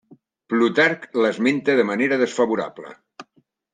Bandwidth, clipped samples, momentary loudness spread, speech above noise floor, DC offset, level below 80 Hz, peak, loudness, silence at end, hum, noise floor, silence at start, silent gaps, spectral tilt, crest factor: 9.6 kHz; under 0.1%; 11 LU; 43 dB; under 0.1%; -72 dBFS; -4 dBFS; -20 LUFS; 0.5 s; none; -63 dBFS; 0.1 s; none; -5 dB/octave; 16 dB